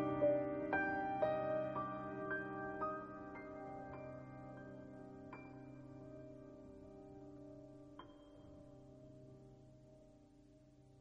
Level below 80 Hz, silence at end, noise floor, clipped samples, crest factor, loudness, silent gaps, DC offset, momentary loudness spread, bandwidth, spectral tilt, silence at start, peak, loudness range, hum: -70 dBFS; 0 s; -65 dBFS; under 0.1%; 20 dB; -44 LUFS; none; under 0.1%; 21 LU; 7.6 kHz; -8.5 dB/octave; 0 s; -24 dBFS; 18 LU; none